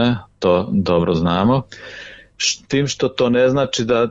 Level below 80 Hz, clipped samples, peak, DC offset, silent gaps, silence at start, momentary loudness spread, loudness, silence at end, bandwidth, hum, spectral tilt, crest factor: -46 dBFS; under 0.1%; -4 dBFS; under 0.1%; none; 0 s; 18 LU; -18 LUFS; 0 s; 8 kHz; none; -5 dB/octave; 14 dB